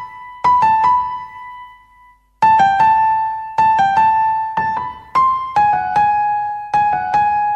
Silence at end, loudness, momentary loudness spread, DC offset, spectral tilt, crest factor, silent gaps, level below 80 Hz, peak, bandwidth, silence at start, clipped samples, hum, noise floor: 0 s; -15 LUFS; 10 LU; under 0.1%; -4.5 dB/octave; 12 dB; none; -50 dBFS; -2 dBFS; 8.2 kHz; 0 s; under 0.1%; none; -49 dBFS